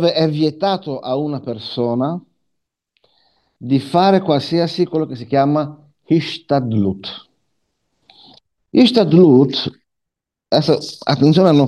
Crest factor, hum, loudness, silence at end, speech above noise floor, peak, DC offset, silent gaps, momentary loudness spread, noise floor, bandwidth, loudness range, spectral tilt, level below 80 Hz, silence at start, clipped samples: 16 dB; none; -16 LUFS; 0 s; 66 dB; 0 dBFS; under 0.1%; none; 14 LU; -81 dBFS; 11.5 kHz; 7 LU; -7.5 dB/octave; -60 dBFS; 0 s; under 0.1%